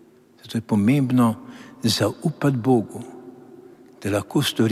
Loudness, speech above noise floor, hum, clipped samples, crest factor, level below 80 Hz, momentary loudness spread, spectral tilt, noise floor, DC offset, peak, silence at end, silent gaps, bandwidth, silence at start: -22 LUFS; 25 dB; none; under 0.1%; 16 dB; -64 dBFS; 17 LU; -6 dB/octave; -46 dBFS; under 0.1%; -6 dBFS; 0 s; none; 15.5 kHz; 0.45 s